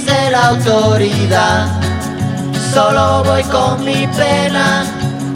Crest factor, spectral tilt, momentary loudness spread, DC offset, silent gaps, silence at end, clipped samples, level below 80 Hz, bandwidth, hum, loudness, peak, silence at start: 12 dB; -5 dB/octave; 7 LU; under 0.1%; none; 0 s; under 0.1%; -36 dBFS; 16 kHz; none; -13 LUFS; 0 dBFS; 0 s